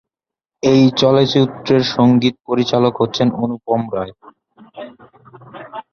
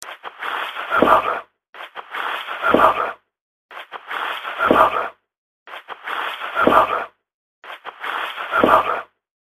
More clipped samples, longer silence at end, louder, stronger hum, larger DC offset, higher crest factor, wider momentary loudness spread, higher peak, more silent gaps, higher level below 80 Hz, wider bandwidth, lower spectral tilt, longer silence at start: neither; second, 0.1 s vs 0.5 s; first, -15 LUFS vs -19 LUFS; second, none vs 50 Hz at -55 dBFS; neither; second, 16 dB vs 22 dB; about the same, 22 LU vs 20 LU; about the same, 0 dBFS vs 0 dBFS; second, none vs 1.69-1.73 s, 3.41-3.69 s, 5.38-5.66 s, 7.34-7.62 s; about the same, -52 dBFS vs -52 dBFS; second, 6.8 kHz vs 14 kHz; first, -6.5 dB/octave vs -4.5 dB/octave; first, 0.65 s vs 0 s